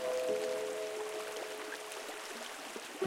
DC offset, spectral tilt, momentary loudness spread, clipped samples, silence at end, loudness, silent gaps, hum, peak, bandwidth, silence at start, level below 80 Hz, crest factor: under 0.1%; -1.5 dB/octave; 8 LU; under 0.1%; 0 s; -40 LUFS; none; none; -22 dBFS; 16.5 kHz; 0 s; -84 dBFS; 18 dB